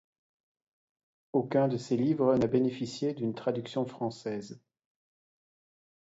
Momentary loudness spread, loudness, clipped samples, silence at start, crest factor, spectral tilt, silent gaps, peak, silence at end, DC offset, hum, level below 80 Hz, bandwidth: 11 LU; -30 LUFS; under 0.1%; 1.35 s; 18 dB; -7.5 dB/octave; none; -14 dBFS; 1.5 s; under 0.1%; none; -68 dBFS; 8 kHz